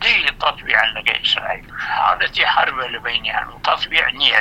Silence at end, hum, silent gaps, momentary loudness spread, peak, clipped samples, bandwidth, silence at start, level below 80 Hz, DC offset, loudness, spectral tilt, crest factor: 0 s; none; none; 8 LU; 0 dBFS; under 0.1%; 16.5 kHz; 0 s; -44 dBFS; under 0.1%; -17 LUFS; -2 dB/octave; 18 dB